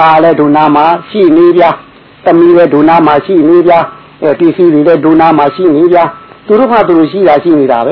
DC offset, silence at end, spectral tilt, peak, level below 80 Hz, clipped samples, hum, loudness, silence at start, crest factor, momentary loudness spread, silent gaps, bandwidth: under 0.1%; 0 s; -9.5 dB/octave; 0 dBFS; -46 dBFS; 4%; none; -6 LUFS; 0 s; 6 dB; 5 LU; none; 5.4 kHz